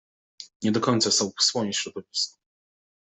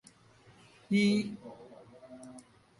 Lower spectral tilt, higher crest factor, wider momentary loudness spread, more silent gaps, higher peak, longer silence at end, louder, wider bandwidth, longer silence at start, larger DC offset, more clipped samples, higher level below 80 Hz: second, -3 dB/octave vs -6 dB/octave; about the same, 20 dB vs 20 dB; second, 10 LU vs 26 LU; first, 0.56-0.60 s vs none; first, -8 dBFS vs -16 dBFS; first, 0.75 s vs 0.4 s; first, -24 LUFS vs -30 LUFS; second, 8.4 kHz vs 11.5 kHz; second, 0.4 s vs 0.9 s; neither; neither; about the same, -70 dBFS vs -74 dBFS